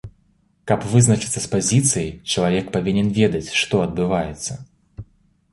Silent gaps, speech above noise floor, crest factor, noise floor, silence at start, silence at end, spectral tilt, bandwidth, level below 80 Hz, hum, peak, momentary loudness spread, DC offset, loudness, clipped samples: none; 42 dB; 18 dB; -61 dBFS; 0.05 s; 0.5 s; -4.5 dB/octave; 11.5 kHz; -44 dBFS; none; -2 dBFS; 10 LU; under 0.1%; -19 LUFS; under 0.1%